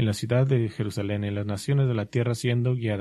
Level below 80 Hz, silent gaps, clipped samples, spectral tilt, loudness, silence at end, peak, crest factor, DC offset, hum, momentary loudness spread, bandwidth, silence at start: -58 dBFS; none; under 0.1%; -7 dB/octave; -26 LUFS; 0 s; -10 dBFS; 14 dB; under 0.1%; none; 6 LU; 12.5 kHz; 0 s